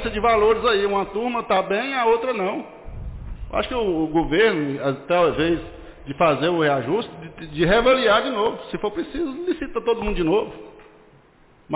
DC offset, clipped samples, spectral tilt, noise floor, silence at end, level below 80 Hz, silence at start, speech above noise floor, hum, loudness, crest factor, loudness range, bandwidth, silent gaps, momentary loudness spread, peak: under 0.1%; under 0.1%; -9.5 dB/octave; -53 dBFS; 0 s; -40 dBFS; 0 s; 33 dB; none; -21 LUFS; 14 dB; 3 LU; 4 kHz; none; 18 LU; -8 dBFS